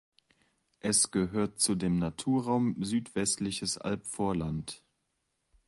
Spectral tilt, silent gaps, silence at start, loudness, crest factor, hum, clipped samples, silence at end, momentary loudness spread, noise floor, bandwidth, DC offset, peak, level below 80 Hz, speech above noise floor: -4 dB/octave; none; 0.85 s; -30 LUFS; 20 dB; none; under 0.1%; 0.9 s; 10 LU; -80 dBFS; 11.5 kHz; under 0.1%; -12 dBFS; -56 dBFS; 49 dB